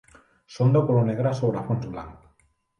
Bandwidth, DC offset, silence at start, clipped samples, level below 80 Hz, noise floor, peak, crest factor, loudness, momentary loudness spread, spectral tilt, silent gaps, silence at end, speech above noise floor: 7 kHz; under 0.1%; 0.5 s; under 0.1%; -56 dBFS; -65 dBFS; -8 dBFS; 16 dB; -23 LUFS; 16 LU; -9 dB/octave; none; 0.65 s; 43 dB